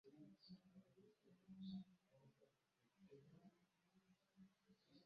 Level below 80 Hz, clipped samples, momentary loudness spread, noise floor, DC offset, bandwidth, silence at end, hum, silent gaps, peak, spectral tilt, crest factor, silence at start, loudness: under -90 dBFS; under 0.1%; 12 LU; -86 dBFS; under 0.1%; 6.4 kHz; 0 s; none; none; -46 dBFS; -7 dB/octave; 20 dB; 0.05 s; -62 LUFS